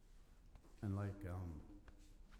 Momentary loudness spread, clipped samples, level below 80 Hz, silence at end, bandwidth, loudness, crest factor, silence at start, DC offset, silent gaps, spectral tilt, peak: 22 LU; under 0.1%; -62 dBFS; 0 s; 13 kHz; -48 LUFS; 18 dB; 0 s; under 0.1%; none; -8.5 dB/octave; -32 dBFS